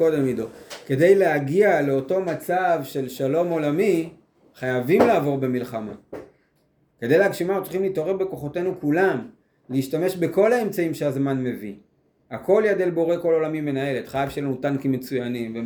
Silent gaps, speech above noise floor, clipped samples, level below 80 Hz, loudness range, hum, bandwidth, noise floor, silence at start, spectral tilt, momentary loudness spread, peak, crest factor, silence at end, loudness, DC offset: none; 43 dB; under 0.1%; -62 dBFS; 3 LU; none; over 20 kHz; -65 dBFS; 0 s; -7 dB/octave; 13 LU; -2 dBFS; 20 dB; 0 s; -22 LUFS; under 0.1%